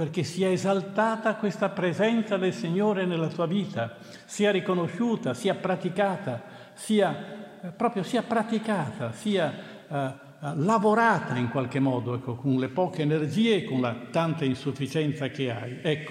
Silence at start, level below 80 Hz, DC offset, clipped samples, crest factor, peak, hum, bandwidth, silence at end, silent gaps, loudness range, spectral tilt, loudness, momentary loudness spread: 0 s; -74 dBFS; under 0.1%; under 0.1%; 18 dB; -10 dBFS; none; 14 kHz; 0 s; none; 3 LU; -6 dB/octave; -27 LUFS; 10 LU